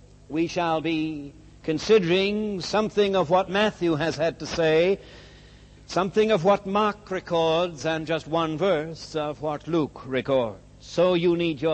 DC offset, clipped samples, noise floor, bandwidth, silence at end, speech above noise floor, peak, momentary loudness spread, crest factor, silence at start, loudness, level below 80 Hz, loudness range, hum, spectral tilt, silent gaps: under 0.1%; under 0.1%; -49 dBFS; 8.6 kHz; 0 s; 25 dB; -8 dBFS; 10 LU; 16 dB; 0.3 s; -24 LUFS; -52 dBFS; 3 LU; 50 Hz at -50 dBFS; -5.5 dB/octave; none